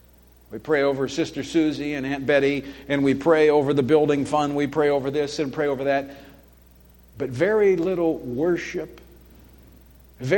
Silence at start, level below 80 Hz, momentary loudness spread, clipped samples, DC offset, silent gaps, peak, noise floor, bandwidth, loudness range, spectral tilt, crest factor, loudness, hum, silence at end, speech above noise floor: 0.5 s; -52 dBFS; 13 LU; under 0.1%; under 0.1%; none; -6 dBFS; -52 dBFS; 17.5 kHz; 4 LU; -6 dB/octave; 18 dB; -22 LUFS; none; 0 s; 31 dB